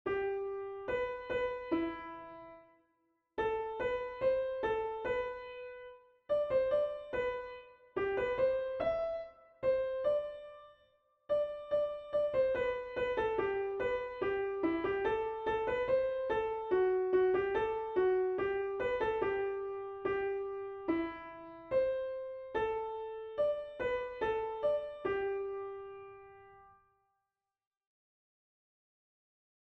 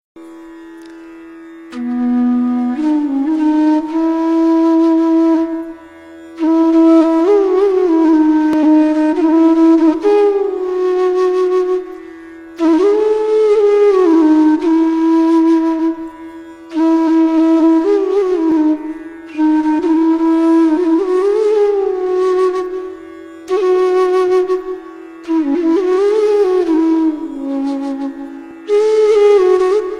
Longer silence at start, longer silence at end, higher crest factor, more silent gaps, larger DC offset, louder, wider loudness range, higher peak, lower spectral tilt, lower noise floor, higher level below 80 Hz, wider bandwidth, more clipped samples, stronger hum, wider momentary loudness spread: about the same, 0.05 s vs 0.15 s; first, 3 s vs 0 s; about the same, 16 dB vs 12 dB; neither; neither; second, -35 LUFS vs -13 LUFS; about the same, 6 LU vs 4 LU; second, -20 dBFS vs -2 dBFS; first, -7 dB/octave vs -5.5 dB/octave; first, -89 dBFS vs -36 dBFS; second, -62 dBFS vs -52 dBFS; second, 6 kHz vs 7.4 kHz; neither; neither; about the same, 13 LU vs 14 LU